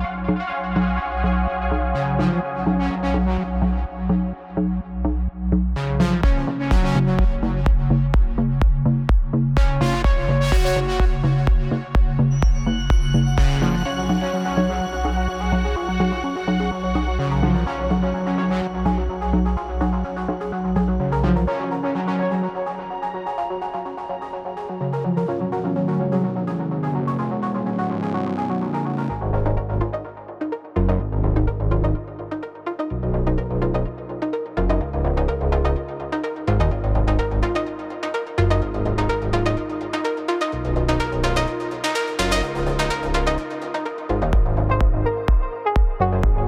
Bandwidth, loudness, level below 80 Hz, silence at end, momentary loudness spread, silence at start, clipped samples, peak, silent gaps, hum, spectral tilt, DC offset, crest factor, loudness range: 12 kHz; -22 LUFS; -24 dBFS; 0 s; 7 LU; 0 s; under 0.1%; -6 dBFS; none; none; -7 dB/octave; under 0.1%; 14 dB; 4 LU